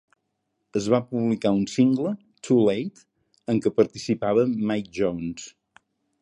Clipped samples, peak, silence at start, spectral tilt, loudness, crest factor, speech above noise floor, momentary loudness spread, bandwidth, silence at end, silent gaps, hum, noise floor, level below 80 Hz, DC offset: under 0.1%; -6 dBFS; 0.75 s; -6.5 dB/octave; -24 LUFS; 18 dB; 54 dB; 13 LU; 11 kHz; 0.7 s; none; none; -77 dBFS; -60 dBFS; under 0.1%